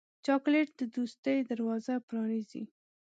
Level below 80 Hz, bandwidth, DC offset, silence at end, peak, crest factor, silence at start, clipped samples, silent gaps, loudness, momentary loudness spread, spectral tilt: -86 dBFS; 8 kHz; under 0.1%; 0.5 s; -16 dBFS; 16 dB; 0.25 s; under 0.1%; 1.18-1.23 s, 2.03-2.08 s; -33 LUFS; 11 LU; -6 dB/octave